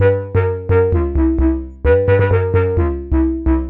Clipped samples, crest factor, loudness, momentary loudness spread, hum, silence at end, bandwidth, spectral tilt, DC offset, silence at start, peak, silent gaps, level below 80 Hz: under 0.1%; 12 dB; -16 LUFS; 5 LU; none; 0 s; 3.9 kHz; -12 dB/octave; under 0.1%; 0 s; -2 dBFS; none; -22 dBFS